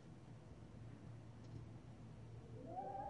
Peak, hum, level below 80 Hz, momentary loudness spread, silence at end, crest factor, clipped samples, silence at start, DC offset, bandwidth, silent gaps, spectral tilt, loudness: -38 dBFS; none; -70 dBFS; 8 LU; 0 s; 16 dB; under 0.1%; 0 s; under 0.1%; 10.5 kHz; none; -8 dB/octave; -56 LUFS